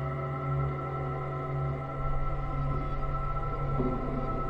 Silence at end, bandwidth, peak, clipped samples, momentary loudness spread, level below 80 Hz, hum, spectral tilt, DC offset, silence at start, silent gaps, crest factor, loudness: 0 s; 5 kHz; -18 dBFS; under 0.1%; 3 LU; -36 dBFS; none; -10 dB/octave; under 0.1%; 0 s; none; 12 dB; -33 LUFS